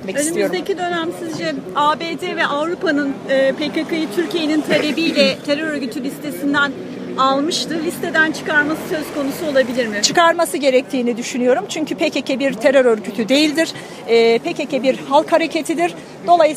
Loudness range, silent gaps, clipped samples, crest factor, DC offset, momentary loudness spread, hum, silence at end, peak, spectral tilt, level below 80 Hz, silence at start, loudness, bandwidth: 3 LU; none; under 0.1%; 18 dB; under 0.1%; 8 LU; none; 0 s; 0 dBFS; -3.5 dB/octave; -60 dBFS; 0 s; -17 LUFS; 15.5 kHz